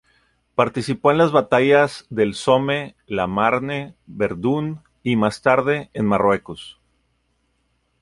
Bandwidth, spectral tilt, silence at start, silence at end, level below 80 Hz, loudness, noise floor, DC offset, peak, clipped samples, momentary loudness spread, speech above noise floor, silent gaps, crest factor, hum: 11.5 kHz; -6 dB/octave; 0.6 s; 1.3 s; -52 dBFS; -20 LUFS; -67 dBFS; under 0.1%; -2 dBFS; under 0.1%; 12 LU; 48 dB; none; 18 dB; none